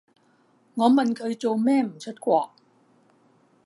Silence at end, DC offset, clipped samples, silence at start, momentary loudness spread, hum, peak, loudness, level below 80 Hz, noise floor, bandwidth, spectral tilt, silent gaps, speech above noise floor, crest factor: 1.2 s; under 0.1%; under 0.1%; 0.75 s; 12 LU; none; -6 dBFS; -23 LUFS; -82 dBFS; -62 dBFS; 11.5 kHz; -6 dB/octave; none; 40 dB; 20 dB